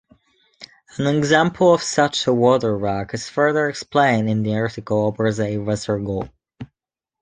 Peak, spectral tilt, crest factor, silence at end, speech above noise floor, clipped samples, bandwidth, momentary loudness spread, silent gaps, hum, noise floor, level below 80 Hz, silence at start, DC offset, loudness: -2 dBFS; -5.5 dB/octave; 18 dB; 0.55 s; 68 dB; under 0.1%; 9.6 kHz; 12 LU; none; none; -87 dBFS; -50 dBFS; 0.6 s; under 0.1%; -19 LUFS